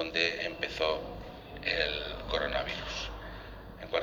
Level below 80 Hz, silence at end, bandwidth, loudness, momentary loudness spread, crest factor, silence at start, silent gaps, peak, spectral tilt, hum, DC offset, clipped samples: -48 dBFS; 0 s; over 20 kHz; -33 LUFS; 16 LU; 24 dB; 0 s; none; -10 dBFS; -3.5 dB/octave; none; under 0.1%; under 0.1%